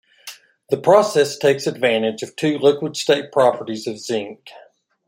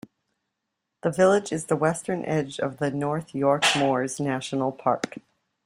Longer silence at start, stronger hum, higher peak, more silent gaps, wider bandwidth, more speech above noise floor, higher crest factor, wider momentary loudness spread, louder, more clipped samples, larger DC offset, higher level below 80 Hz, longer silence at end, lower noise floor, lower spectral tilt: second, 0.25 s vs 1.05 s; neither; first, 0 dBFS vs -8 dBFS; neither; about the same, 16 kHz vs 15.5 kHz; second, 23 dB vs 57 dB; about the same, 18 dB vs 18 dB; first, 13 LU vs 9 LU; first, -18 LUFS vs -25 LUFS; neither; neither; about the same, -68 dBFS vs -66 dBFS; first, 0.6 s vs 0.45 s; second, -42 dBFS vs -82 dBFS; about the same, -4.5 dB/octave vs -4.5 dB/octave